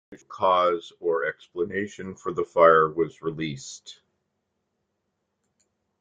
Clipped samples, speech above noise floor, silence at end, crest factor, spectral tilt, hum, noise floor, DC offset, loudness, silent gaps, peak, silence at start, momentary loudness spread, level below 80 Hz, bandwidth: under 0.1%; 54 dB; 2.1 s; 22 dB; -5 dB/octave; none; -78 dBFS; under 0.1%; -24 LUFS; none; -4 dBFS; 0.1 s; 18 LU; -66 dBFS; 9 kHz